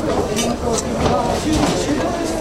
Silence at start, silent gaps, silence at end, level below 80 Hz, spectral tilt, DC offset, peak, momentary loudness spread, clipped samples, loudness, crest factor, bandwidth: 0 s; none; 0 s; -32 dBFS; -4.5 dB/octave; under 0.1%; -2 dBFS; 3 LU; under 0.1%; -19 LUFS; 16 dB; 16 kHz